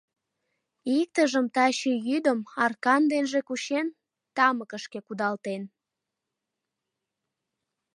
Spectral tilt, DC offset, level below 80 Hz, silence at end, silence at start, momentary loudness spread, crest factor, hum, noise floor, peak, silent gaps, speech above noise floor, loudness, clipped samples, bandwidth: -3.5 dB/octave; under 0.1%; -84 dBFS; 2.3 s; 0.85 s; 14 LU; 20 dB; none; -86 dBFS; -8 dBFS; none; 61 dB; -26 LUFS; under 0.1%; 11 kHz